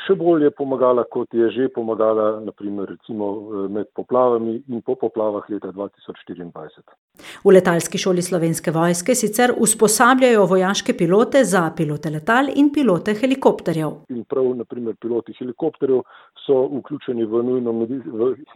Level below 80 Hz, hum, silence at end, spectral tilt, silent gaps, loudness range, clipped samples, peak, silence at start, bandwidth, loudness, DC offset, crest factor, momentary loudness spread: -64 dBFS; none; 0.1 s; -5 dB/octave; 6.98-7.08 s; 7 LU; under 0.1%; 0 dBFS; 0 s; 16 kHz; -19 LUFS; under 0.1%; 18 dB; 14 LU